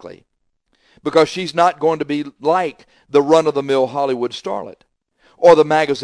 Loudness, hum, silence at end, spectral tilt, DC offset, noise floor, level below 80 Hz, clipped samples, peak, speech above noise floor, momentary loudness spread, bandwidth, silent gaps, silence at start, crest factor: -16 LUFS; none; 0 s; -5 dB/octave; under 0.1%; -66 dBFS; -60 dBFS; under 0.1%; 0 dBFS; 49 dB; 14 LU; 10.5 kHz; none; 0.05 s; 18 dB